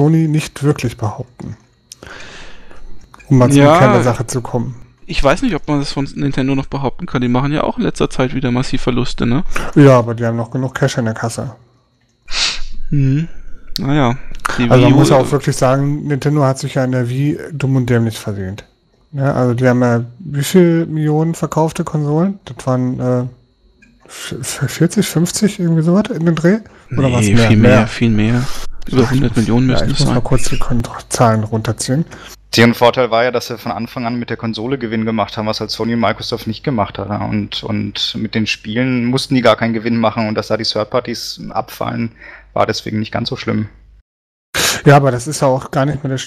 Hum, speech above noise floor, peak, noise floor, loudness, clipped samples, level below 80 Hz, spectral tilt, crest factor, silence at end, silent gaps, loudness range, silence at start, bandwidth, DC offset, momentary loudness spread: none; 43 dB; 0 dBFS; -57 dBFS; -15 LUFS; under 0.1%; -30 dBFS; -6 dB/octave; 14 dB; 0 s; 44.01-44.53 s; 6 LU; 0 s; 14.5 kHz; under 0.1%; 13 LU